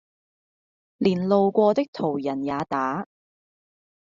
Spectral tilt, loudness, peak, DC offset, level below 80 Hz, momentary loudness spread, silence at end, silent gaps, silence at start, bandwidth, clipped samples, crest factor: -6 dB/octave; -24 LUFS; -6 dBFS; under 0.1%; -66 dBFS; 8 LU; 1 s; 1.88-1.93 s; 1 s; 7.4 kHz; under 0.1%; 18 dB